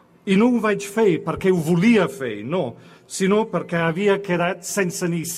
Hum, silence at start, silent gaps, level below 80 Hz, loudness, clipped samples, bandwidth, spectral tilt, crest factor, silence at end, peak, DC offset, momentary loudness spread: none; 0.25 s; none; -56 dBFS; -20 LUFS; under 0.1%; 15.5 kHz; -5.5 dB/octave; 14 dB; 0 s; -6 dBFS; under 0.1%; 8 LU